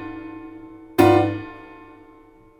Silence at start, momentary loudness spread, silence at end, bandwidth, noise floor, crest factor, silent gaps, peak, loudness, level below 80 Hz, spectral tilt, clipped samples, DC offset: 0 s; 25 LU; 1 s; 16 kHz; -50 dBFS; 22 dB; none; 0 dBFS; -19 LUFS; -52 dBFS; -7 dB/octave; under 0.1%; under 0.1%